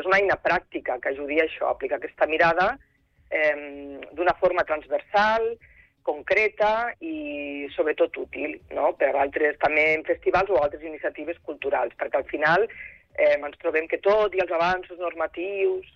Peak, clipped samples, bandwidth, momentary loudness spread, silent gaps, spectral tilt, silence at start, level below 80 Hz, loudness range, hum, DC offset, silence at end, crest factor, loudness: -10 dBFS; under 0.1%; 6.8 kHz; 11 LU; none; -5.5 dB/octave; 0 s; -56 dBFS; 2 LU; none; under 0.1%; 0.15 s; 16 dB; -24 LUFS